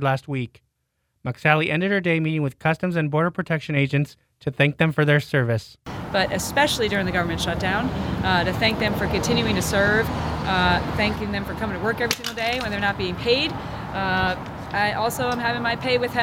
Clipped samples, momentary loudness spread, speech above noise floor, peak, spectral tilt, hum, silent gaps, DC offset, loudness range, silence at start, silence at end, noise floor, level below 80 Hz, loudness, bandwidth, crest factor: under 0.1%; 8 LU; 51 dB; -2 dBFS; -5 dB/octave; none; none; under 0.1%; 2 LU; 0 s; 0 s; -73 dBFS; -40 dBFS; -22 LUFS; 17 kHz; 22 dB